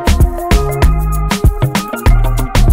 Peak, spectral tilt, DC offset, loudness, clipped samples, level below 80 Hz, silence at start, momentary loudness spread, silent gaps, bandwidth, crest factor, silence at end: 0 dBFS; -5.5 dB/octave; under 0.1%; -14 LUFS; under 0.1%; -12 dBFS; 0 s; 3 LU; none; 16.5 kHz; 10 dB; 0 s